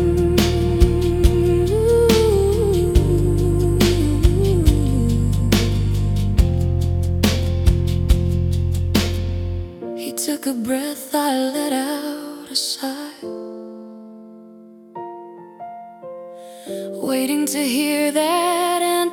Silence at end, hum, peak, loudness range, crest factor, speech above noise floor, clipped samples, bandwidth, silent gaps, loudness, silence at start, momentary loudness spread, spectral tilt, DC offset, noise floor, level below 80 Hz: 0 s; none; -2 dBFS; 13 LU; 18 dB; 23 dB; under 0.1%; 18 kHz; none; -19 LUFS; 0 s; 18 LU; -6 dB/octave; under 0.1%; -43 dBFS; -26 dBFS